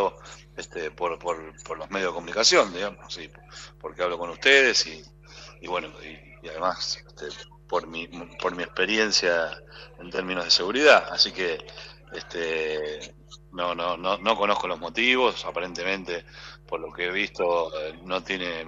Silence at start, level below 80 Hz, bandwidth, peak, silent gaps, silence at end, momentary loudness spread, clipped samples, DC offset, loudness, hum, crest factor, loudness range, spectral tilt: 0 s; -54 dBFS; 8.4 kHz; -2 dBFS; none; 0 s; 23 LU; under 0.1%; under 0.1%; -24 LUFS; 50 Hz at -50 dBFS; 24 dB; 7 LU; -2 dB/octave